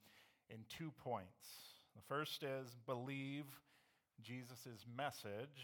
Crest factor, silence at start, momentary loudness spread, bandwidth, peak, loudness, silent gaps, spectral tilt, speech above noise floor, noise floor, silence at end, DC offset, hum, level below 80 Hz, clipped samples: 20 dB; 0 s; 16 LU; 19 kHz; -30 dBFS; -50 LUFS; none; -5 dB/octave; 28 dB; -78 dBFS; 0 s; under 0.1%; none; -88 dBFS; under 0.1%